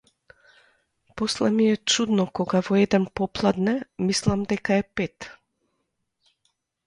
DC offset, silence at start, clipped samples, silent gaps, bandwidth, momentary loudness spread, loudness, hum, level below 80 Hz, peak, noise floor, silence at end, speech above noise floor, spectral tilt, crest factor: under 0.1%; 1.15 s; under 0.1%; none; 11.5 kHz; 9 LU; -23 LUFS; none; -54 dBFS; -6 dBFS; -76 dBFS; 1.55 s; 53 dB; -5 dB/octave; 18 dB